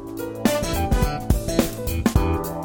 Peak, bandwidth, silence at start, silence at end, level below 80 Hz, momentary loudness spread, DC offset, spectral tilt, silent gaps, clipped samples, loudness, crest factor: -6 dBFS; 17.5 kHz; 0 s; 0 s; -28 dBFS; 3 LU; under 0.1%; -5.5 dB/octave; none; under 0.1%; -23 LUFS; 16 dB